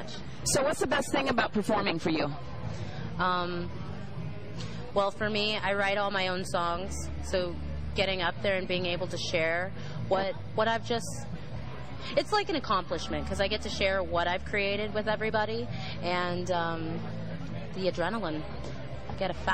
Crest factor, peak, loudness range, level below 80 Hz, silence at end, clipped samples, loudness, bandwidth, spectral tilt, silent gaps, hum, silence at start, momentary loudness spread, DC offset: 18 dB; -12 dBFS; 3 LU; -46 dBFS; 0 s; under 0.1%; -31 LUFS; 15.5 kHz; -4.5 dB/octave; none; none; 0 s; 12 LU; 1%